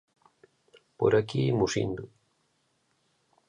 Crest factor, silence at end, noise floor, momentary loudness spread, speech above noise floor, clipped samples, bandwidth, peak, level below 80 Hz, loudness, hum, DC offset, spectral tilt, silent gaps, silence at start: 20 dB; 1.4 s; -73 dBFS; 13 LU; 46 dB; under 0.1%; 10.5 kHz; -12 dBFS; -60 dBFS; -27 LUFS; none; under 0.1%; -6 dB/octave; none; 1 s